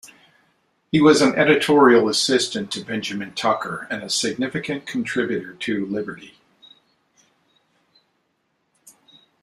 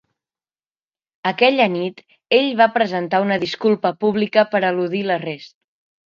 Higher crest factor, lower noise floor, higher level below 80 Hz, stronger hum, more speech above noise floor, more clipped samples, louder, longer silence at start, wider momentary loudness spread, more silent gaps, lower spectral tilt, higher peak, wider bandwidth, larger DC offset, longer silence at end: about the same, 20 dB vs 20 dB; second, -70 dBFS vs under -90 dBFS; first, -62 dBFS vs -68 dBFS; neither; second, 51 dB vs over 72 dB; neither; about the same, -20 LUFS vs -18 LUFS; second, 0.05 s vs 1.25 s; first, 13 LU vs 10 LU; neither; second, -4 dB/octave vs -6.5 dB/octave; about the same, -2 dBFS vs 0 dBFS; first, 13 kHz vs 7.4 kHz; neither; first, 3.15 s vs 0.65 s